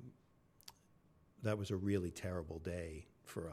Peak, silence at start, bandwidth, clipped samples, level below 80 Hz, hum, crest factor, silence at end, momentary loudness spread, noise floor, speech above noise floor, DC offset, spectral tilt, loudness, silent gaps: -24 dBFS; 0 s; 15.5 kHz; under 0.1%; -62 dBFS; none; 20 dB; 0 s; 21 LU; -70 dBFS; 29 dB; under 0.1%; -6.5 dB/octave; -43 LUFS; none